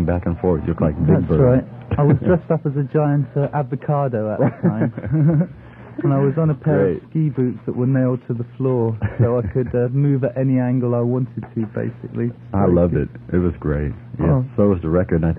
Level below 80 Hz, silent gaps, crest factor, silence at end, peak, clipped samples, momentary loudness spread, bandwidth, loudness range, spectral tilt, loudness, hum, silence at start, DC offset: -38 dBFS; none; 16 dB; 0 s; -2 dBFS; under 0.1%; 8 LU; 3.5 kHz; 3 LU; -13 dB/octave; -19 LUFS; none; 0 s; under 0.1%